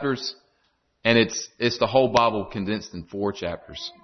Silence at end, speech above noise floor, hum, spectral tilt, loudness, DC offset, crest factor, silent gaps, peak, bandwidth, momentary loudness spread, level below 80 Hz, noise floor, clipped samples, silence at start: 0.15 s; 45 dB; none; -4.5 dB/octave; -24 LUFS; under 0.1%; 20 dB; none; -4 dBFS; 6.4 kHz; 13 LU; -54 dBFS; -69 dBFS; under 0.1%; 0 s